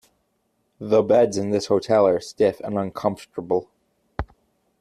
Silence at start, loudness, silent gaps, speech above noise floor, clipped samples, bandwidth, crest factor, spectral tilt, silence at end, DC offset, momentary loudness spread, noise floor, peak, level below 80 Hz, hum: 0.8 s; -21 LUFS; none; 50 dB; under 0.1%; 13 kHz; 18 dB; -6 dB/octave; 0.55 s; under 0.1%; 17 LU; -70 dBFS; -6 dBFS; -48 dBFS; none